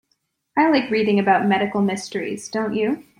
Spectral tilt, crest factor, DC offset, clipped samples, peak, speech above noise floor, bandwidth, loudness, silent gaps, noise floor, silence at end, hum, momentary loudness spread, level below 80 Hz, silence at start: -5.5 dB/octave; 18 dB; under 0.1%; under 0.1%; -4 dBFS; 51 dB; 11.5 kHz; -20 LUFS; none; -71 dBFS; 0.15 s; none; 9 LU; -64 dBFS; 0.55 s